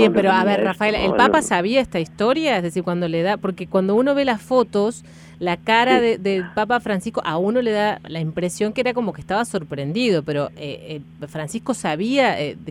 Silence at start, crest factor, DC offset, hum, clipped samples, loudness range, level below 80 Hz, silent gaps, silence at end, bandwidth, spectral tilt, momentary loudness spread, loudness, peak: 0 s; 20 dB; under 0.1%; none; under 0.1%; 4 LU; -50 dBFS; none; 0 s; 14.5 kHz; -5 dB/octave; 10 LU; -20 LUFS; 0 dBFS